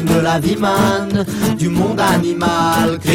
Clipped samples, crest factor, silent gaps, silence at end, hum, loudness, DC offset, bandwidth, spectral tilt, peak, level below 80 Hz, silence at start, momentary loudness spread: under 0.1%; 12 dB; none; 0 s; none; -15 LUFS; under 0.1%; 17 kHz; -5.5 dB/octave; -2 dBFS; -40 dBFS; 0 s; 3 LU